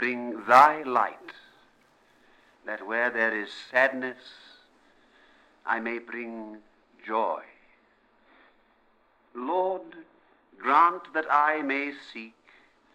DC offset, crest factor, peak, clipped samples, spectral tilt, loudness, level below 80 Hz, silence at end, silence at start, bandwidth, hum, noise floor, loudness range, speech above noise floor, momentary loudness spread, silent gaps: under 0.1%; 26 dB; -4 dBFS; under 0.1%; -4 dB/octave; -25 LUFS; -78 dBFS; 0.65 s; 0 s; 17.5 kHz; none; -65 dBFS; 11 LU; 39 dB; 24 LU; none